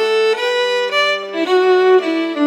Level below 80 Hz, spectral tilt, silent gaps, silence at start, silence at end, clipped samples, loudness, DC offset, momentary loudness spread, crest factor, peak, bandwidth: under -90 dBFS; -2 dB/octave; none; 0 s; 0 s; under 0.1%; -15 LUFS; under 0.1%; 5 LU; 12 dB; -4 dBFS; 11.5 kHz